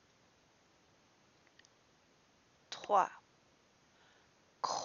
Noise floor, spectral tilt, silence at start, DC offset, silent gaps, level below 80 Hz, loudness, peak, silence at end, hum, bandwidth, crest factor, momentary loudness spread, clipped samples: -70 dBFS; -0.5 dB/octave; 2.7 s; under 0.1%; none; -88 dBFS; -36 LUFS; -18 dBFS; 0 s; none; 7.2 kHz; 26 dB; 18 LU; under 0.1%